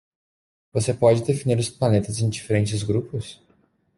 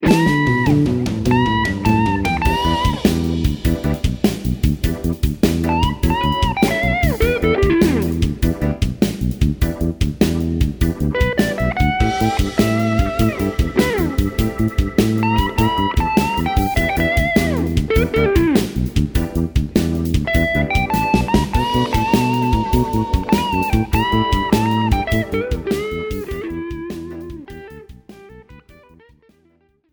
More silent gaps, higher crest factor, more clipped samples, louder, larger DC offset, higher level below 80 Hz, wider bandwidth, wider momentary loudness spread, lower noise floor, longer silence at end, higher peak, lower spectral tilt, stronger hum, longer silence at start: neither; about the same, 20 dB vs 16 dB; neither; second, -23 LUFS vs -18 LUFS; neither; second, -56 dBFS vs -24 dBFS; second, 11.5 kHz vs over 20 kHz; first, 11 LU vs 5 LU; first, -63 dBFS vs -58 dBFS; second, 0.65 s vs 1.35 s; second, -4 dBFS vs 0 dBFS; about the same, -6 dB/octave vs -6.5 dB/octave; neither; first, 0.75 s vs 0 s